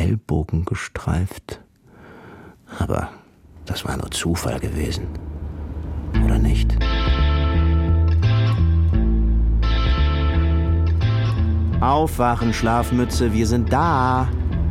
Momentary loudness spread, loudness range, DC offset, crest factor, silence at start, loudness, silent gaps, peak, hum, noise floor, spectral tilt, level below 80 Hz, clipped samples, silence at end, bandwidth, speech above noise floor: 11 LU; 9 LU; under 0.1%; 16 dB; 0 s; -20 LUFS; none; -4 dBFS; none; -46 dBFS; -6.5 dB/octave; -22 dBFS; under 0.1%; 0 s; 15 kHz; 27 dB